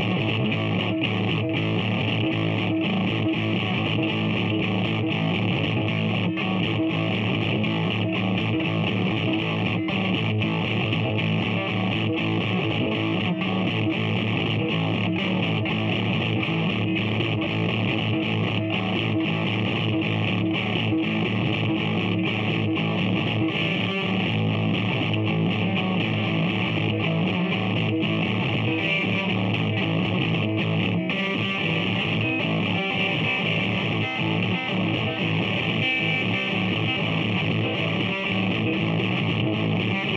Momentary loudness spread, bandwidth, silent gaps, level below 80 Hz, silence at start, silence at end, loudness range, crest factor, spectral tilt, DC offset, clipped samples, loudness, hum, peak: 1 LU; 7 kHz; none; -54 dBFS; 0 s; 0 s; 1 LU; 14 dB; -7.5 dB/octave; under 0.1%; under 0.1%; -24 LUFS; none; -10 dBFS